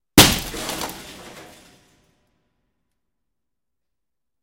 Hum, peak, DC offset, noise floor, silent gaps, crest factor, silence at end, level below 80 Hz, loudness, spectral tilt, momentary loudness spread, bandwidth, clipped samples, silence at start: none; 0 dBFS; under 0.1%; -85 dBFS; none; 24 dB; 3 s; -40 dBFS; -18 LUFS; -2.5 dB/octave; 27 LU; 17 kHz; under 0.1%; 0.15 s